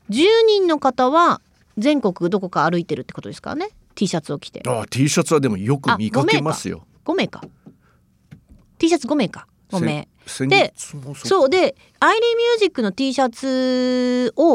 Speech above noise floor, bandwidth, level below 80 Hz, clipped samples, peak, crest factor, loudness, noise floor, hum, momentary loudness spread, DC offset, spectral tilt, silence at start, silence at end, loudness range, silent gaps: 39 dB; 15.5 kHz; -58 dBFS; under 0.1%; -2 dBFS; 18 dB; -19 LUFS; -57 dBFS; none; 14 LU; under 0.1%; -5 dB/octave; 0.1 s; 0 s; 6 LU; none